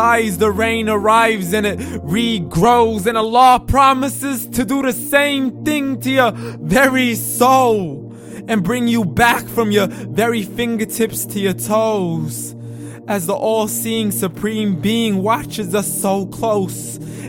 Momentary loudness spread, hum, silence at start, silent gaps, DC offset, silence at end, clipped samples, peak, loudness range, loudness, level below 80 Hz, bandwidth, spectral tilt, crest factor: 9 LU; none; 0 s; none; under 0.1%; 0 s; under 0.1%; 0 dBFS; 5 LU; -16 LUFS; -40 dBFS; 17 kHz; -4.5 dB/octave; 16 dB